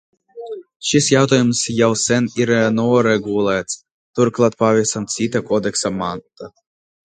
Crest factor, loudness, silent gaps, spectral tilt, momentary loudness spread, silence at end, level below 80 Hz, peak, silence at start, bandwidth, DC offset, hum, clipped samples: 18 dB; -17 LUFS; 0.76-0.80 s, 3.91-4.14 s; -4.5 dB/octave; 17 LU; 0.55 s; -54 dBFS; 0 dBFS; 0.35 s; 9.6 kHz; under 0.1%; none; under 0.1%